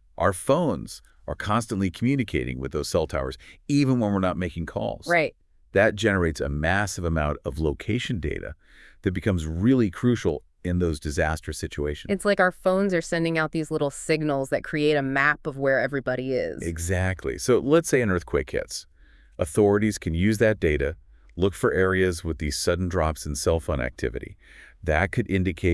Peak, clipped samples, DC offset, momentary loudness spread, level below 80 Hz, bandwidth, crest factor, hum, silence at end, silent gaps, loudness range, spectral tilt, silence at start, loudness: -6 dBFS; under 0.1%; under 0.1%; 9 LU; -42 dBFS; 12 kHz; 18 dB; none; 0 s; none; 3 LU; -5.5 dB/octave; 0.2 s; -25 LUFS